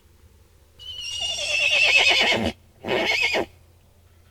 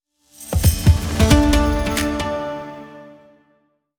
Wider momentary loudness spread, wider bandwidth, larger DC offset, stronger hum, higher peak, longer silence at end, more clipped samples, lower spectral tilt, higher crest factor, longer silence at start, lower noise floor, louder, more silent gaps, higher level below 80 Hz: about the same, 21 LU vs 21 LU; about the same, 18.5 kHz vs over 20 kHz; neither; neither; second, -4 dBFS vs 0 dBFS; about the same, 0.85 s vs 0.9 s; neither; second, -1.5 dB/octave vs -5.5 dB/octave; about the same, 20 dB vs 18 dB; first, 0.8 s vs 0.4 s; second, -54 dBFS vs -63 dBFS; about the same, -19 LUFS vs -18 LUFS; neither; second, -52 dBFS vs -24 dBFS